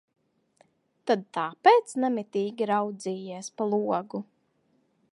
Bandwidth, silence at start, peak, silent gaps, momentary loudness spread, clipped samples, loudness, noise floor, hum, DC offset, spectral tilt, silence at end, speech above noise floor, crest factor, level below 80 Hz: 11.5 kHz; 1.05 s; -6 dBFS; none; 16 LU; under 0.1%; -27 LUFS; -70 dBFS; none; under 0.1%; -5 dB/octave; 0.9 s; 43 dB; 22 dB; -84 dBFS